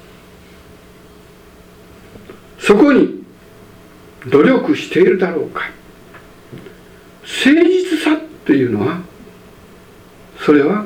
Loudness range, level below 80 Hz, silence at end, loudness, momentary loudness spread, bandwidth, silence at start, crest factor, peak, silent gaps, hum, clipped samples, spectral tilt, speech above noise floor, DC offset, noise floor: 3 LU; -50 dBFS; 0 s; -14 LUFS; 23 LU; 15.5 kHz; 2.15 s; 16 dB; 0 dBFS; none; none; under 0.1%; -6 dB/octave; 30 dB; under 0.1%; -42 dBFS